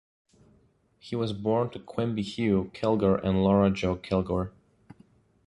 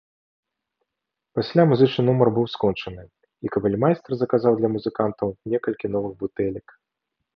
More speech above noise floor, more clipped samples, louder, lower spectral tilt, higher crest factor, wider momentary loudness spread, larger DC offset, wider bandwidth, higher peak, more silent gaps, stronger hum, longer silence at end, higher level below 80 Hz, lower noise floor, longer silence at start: second, 38 dB vs 62 dB; neither; second, -27 LUFS vs -22 LUFS; second, -8 dB/octave vs -9.5 dB/octave; about the same, 18 dB vs 22 dB; second, 9 LU vs 12 LU; neither; first, 10.5 kHz vs 6.2 kHz; second, -10 dBFS vs -2 dBFS; neither; neither; first, 1 s vs 0.8 s; first, -48 dBFS vs -56 dBFS; second, -64 dBFS vs -84 dBFS; second, 1.05 s vs 1.35 s